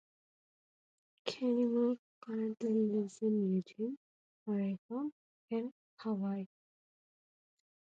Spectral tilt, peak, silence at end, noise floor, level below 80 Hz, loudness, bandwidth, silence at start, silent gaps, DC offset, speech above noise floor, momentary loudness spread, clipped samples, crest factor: -7.5 dB/octave; -22 dBFS; 1.45 s; under -90 dBFS; -88 dBFS; -37 LUFS; 8.8 kHz; 1.25 s; 1.99-2.21 s, 3.97-4.46 s, 4.78-4.89 s, 5.12-5.48 s, 5.72-5.97 s; under 0.1%; over 55 dB; 12 LU; under 0.1%; 16 dB